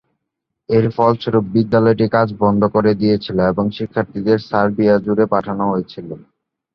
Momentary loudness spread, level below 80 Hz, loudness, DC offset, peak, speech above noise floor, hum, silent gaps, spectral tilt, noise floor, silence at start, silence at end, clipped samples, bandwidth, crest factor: 7 LU; -48 dBFS; -16 LUFS; under 0.1%; -2 dBFS; 62 dB; none; none; -9.5 dB/octave; -78 dBFS; 0.7 s; 0.55 s; under 0.1%; 6 kHz; 14 dB